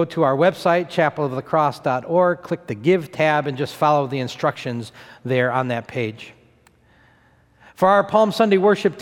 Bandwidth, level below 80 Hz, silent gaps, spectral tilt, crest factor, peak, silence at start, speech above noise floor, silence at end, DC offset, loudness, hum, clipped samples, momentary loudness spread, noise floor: 16.5 kHz; -62 dBFS; none; -6.5 dB/octave; 18 dB; -2 dBFS; 0 s; 37 dB; 0 s; under 0.1%; -20 LUFS; none; under 0.1%; 11 LU; -56 dBFS